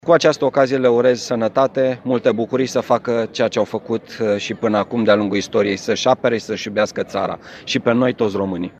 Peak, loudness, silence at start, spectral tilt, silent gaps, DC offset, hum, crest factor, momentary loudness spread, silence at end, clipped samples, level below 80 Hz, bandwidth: 0 dBFS; -18 LUFS; 0.05 s; -5 dB/octave; none; under 0.1%; none; 18 dB; 7 LU; 0.1 s; under 0.1%; -60 dBFS; 8.8 kHz